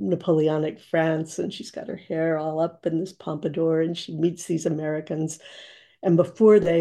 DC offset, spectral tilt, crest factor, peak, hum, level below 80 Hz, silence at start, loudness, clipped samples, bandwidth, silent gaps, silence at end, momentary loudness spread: under 0.1%; -6.5 dB/octave; 18 dB; -6 dBFS; none; -66 dBFS; 0 s; -24 LUFS; under 0.1%; 12.5 kHz; none; 0 s; 13 LU